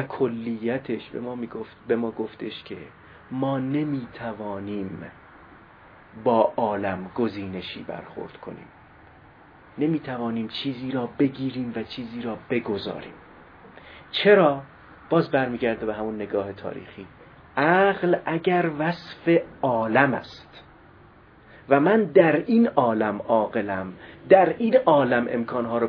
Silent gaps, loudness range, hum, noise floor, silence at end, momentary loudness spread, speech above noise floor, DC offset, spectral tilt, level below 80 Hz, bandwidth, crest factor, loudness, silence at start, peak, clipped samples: none; 10 LU; none; -51 dBFS; 0 s; 18 LU; 28 dB; under 0.1%; -9 dB/octave; -60 dBFS; 5.4 kHz; 22 dB; -24 LUFS; 0 s; -2 dBFS; under 0.1%